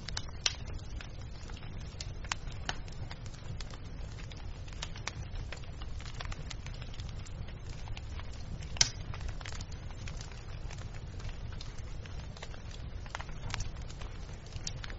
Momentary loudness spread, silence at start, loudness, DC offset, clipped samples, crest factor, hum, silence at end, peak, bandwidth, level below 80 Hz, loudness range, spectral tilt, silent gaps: 10 LU; 0 s; -41 LUFS; under 0.1%; under 0.1%; 36 dB; none; 0 s; -4 dBFS; 8 kHz; -44 dBFS; 7 LU; -3 dB/octave; none